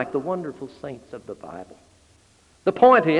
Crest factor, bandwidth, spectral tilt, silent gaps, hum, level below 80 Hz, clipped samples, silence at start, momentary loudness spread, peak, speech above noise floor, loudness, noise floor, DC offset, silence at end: 20 dB; 10 kHz; -7 dB/octave; none; none; -62 dBFS; under 0.1%; 0 s; 23 LU; -4 dBFS; 36 dB; -20 LUFS; -57 dBFS; under 0.1%; 0 s